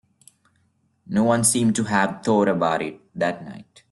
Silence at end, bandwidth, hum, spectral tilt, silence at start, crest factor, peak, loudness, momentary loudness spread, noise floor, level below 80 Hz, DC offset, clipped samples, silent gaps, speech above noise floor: 0.3 s; 12.5 kHz; none; -4.5 dB/octave; 1.1 s; 18 dB; -4 dBFS; -21 LUFS; 11 LU; -66 dBFS; -62 dBFS; under 0.1%; under 0.1%; none; 45 dB